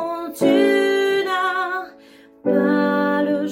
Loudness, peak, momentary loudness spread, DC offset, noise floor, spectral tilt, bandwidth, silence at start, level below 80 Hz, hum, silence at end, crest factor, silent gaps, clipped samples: -19 LUFS; -4 dBFS; 11 LU; under 0.1%; -47 dBFS; -5.5 dB/octave; 16.5 kHz; 0 s; -66 dBFS; none; 0 s; 14 dB; none; under 0.1%